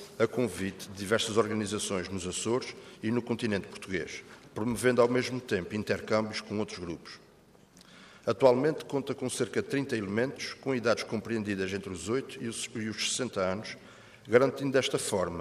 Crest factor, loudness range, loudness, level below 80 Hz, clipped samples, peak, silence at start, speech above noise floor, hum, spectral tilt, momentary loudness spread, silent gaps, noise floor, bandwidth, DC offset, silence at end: 22 dB; 3 LU; -31 LUFS; -66 dBFS; under 0.1%; -8 dBFS; 0 s; 28 dB; none; -4.5 dB/octave; 12 LU; none; -59 dBFS; 15 kHz; under 0.1%; 0 s